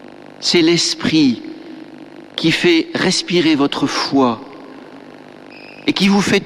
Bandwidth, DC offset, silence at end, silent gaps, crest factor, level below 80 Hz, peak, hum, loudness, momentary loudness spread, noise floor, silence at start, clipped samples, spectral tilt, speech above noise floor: 13 kHz; under 0.1%; 0 s; none; 16 dB; -52 dBFS; -2 dBFS; 50 Hz at -50 dBFS; -15 LUFS; 23 LU; -38 dBFS; 0.1 s; under 0.1%; -4 dB/octave; 23 dB